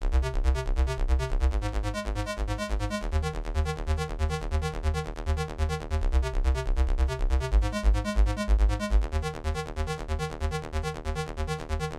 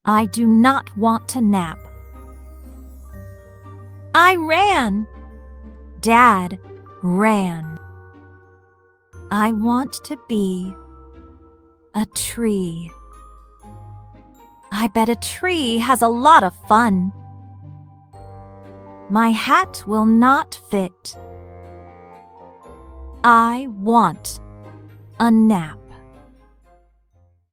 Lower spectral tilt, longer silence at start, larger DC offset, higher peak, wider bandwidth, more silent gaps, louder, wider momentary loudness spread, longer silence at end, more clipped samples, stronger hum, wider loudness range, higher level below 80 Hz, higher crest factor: about the same, -6 dB/octave vs -5 dB/octave; about the same, 0 s vs 0.05 s; neither; second, -12 dBFS vs 0 dBFS; second, 12 kHz vs 16.5 kHz; neither; second, -30 LUFS vs -17 LUFS; second, 6 LU vs 22 LU; second, 0 s vs 1.6 s; neither; neither; second, 3 LU vs 8 LU; first, -28 dBFS vs -46 dBFS; second, 14 dB vs 20 dB